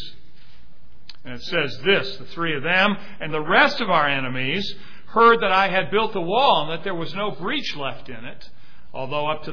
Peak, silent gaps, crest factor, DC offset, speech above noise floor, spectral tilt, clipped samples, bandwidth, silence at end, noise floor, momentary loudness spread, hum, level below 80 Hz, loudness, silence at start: -2 dBFS; none; 20 dB; 4%; 31 dB; -5.5 dB/octave; under 0.1%; 5.4 kHz; 0 s; -53 dBFS; 19 LU; none; -54 dBFS; -21 LUFS; 0 s